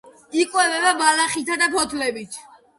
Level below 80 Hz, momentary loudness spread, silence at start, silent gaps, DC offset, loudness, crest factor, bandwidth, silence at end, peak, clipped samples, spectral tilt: -60 dBFS; 14 LU; 0.05 s; none; under 0.1%; -19 LUFS; 18 dB; 12 kHz; 0.35 s; -2 dBFS; under 0.1%; -0.5 dB/octave